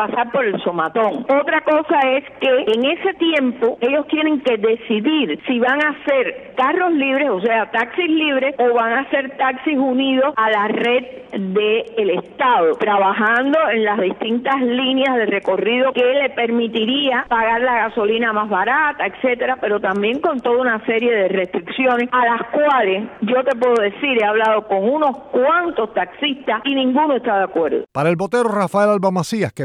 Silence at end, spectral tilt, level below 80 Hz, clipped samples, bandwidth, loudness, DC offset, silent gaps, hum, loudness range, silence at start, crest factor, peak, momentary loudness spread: 0 s; -5.5 dB/octave; -58 dBFS; under 0.1%; 11.5 kHz; -17 LUFS; under 0.1%; none; none; 1 LU; 0 s; 12 dB; -4 dBFS; 4 LU